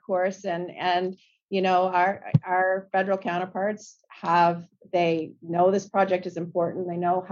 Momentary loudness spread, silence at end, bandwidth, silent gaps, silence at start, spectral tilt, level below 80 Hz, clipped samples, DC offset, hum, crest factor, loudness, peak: 9 LU; 0 s; 7.6 kHz; 1.43-1.48 s; 0.1 s; -6.5 dB/octave; -70 dBFS; under 0.1%; under 0.1%; none; 20 dB; -25 LUFS; -6 dBFS